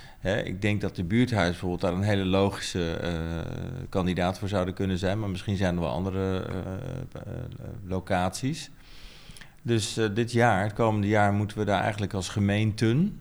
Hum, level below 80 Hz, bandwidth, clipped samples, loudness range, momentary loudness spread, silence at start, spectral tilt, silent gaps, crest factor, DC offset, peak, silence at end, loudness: none; -48 dBFS; over 20 kHz; under 0.1%; 7 LU; 14 LU; 0 s; -6 dB/octave; none; 18 dB; under 0.1%; -8 dBFS; 0 s; -27 LUFS